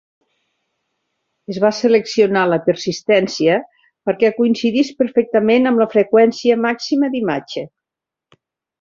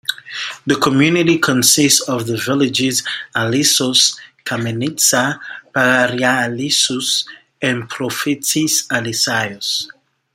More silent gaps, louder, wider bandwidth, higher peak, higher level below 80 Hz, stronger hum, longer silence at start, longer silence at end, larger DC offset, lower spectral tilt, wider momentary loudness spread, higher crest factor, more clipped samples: neither; about the same, -16 LUFS vs -15 LUFS; second, 7.4 kHz vs 16.5 kHz; about the same, -2 dBFS vs 0 dBFS; about the same, -62 dBFS vs -58 dBFS; neither; first, 1.5 s vs 0.1 s; first, 1.15 s vs 0.5 s; neither; first, -5.5 dB/octave vs -2.5 dB/octave; about the same, 9 LU vs 11 LU; about the same, 16 dB vs 16 dB; neither